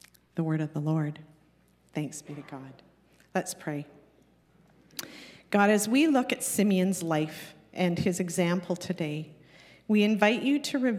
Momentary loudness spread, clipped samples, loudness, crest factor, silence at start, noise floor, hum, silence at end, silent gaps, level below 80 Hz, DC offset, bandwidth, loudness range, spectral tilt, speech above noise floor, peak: 19 LU; under 0.1%; -28 LUFS; 24 dB; 0.35 s; -64 dBFS; none; 0 s; none; -72 dBFS; under 0.1%; 16 kHz; 12 LU; -5 dB/octave; 37 dB; -6 dBFS